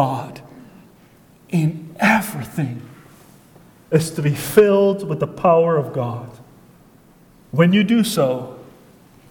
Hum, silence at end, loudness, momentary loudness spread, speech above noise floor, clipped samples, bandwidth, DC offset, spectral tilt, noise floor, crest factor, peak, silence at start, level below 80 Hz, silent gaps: none; 0.65 s; -18 LUFS; 14 LU; 32 dB; under 0.1%; 19 kHz; under 0.1%; -6 dB/octave; -50 dBFS; 20 dB; 0 dBFS; 0 s; -56 dBFS; none